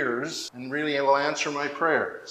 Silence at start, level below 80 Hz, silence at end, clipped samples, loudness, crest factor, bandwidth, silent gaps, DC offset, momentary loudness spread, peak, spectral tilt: 0 s; -76 dBFS; 0 s; under 0.1%; -26 LUFS; 18 dB; 14.5 kHz; none; under 0.1%; 9 LU; -10 dBFS; -3.5 dB/octave